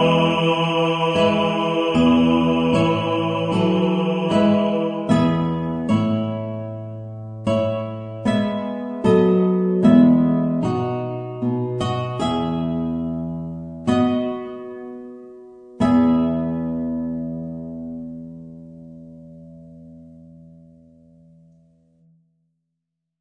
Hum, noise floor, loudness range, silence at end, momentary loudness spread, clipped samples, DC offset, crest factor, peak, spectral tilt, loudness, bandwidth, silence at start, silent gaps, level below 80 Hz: none; -79 dBFS; 10 LU; 2.7 s; 17 LU; under 0.1%; under 0.1%; 18 dB; -2 dBFS; -7.5 dB/octave; -20 LUFS; 9.8 kHz; 0 s; none; -50 dBFS